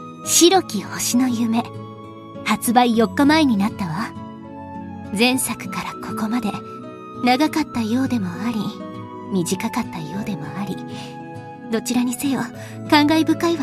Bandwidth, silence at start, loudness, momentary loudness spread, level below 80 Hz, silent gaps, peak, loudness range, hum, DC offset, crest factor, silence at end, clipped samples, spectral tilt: 15 kHz; 0 s; -20 LUFS; 19 LU; -52 dBFS; none; 0 dBFS; 7 LU; none; under 0.1%; 20 dB; 0 s; under 0.1%; -4 dB/octave